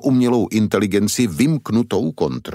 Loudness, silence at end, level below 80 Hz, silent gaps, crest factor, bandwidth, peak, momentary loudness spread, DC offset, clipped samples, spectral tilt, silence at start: -18 LUFS; 0 s; -50 dBFS; none; 14 dB; 16 kHz; -4 dBFS; 5 LU; under 0.1%; under 0.1%; -6 dB/octave; 0 s